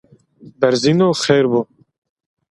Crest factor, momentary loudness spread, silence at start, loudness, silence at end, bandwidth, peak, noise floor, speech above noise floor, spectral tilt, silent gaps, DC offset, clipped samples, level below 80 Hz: 18 dB; 6 LU; 0.45 s; -15 LUFS; 0.9 s; 11.5 kHz; 0 dBFS; -44 dBFS; 30 dB; -5.5 dB/octave; none; under 0.1%; under 0.1%; -58 dBFS